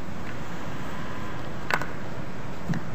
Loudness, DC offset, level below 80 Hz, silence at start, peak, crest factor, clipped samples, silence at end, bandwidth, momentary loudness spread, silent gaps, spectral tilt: -34 LUFS; 5%; -48 dBFS; 0 s; -4 dBFS; 28 dB; under 0.1%; 0 s; 15.5 kHz; 8 LU; none; -5.5 dB/octave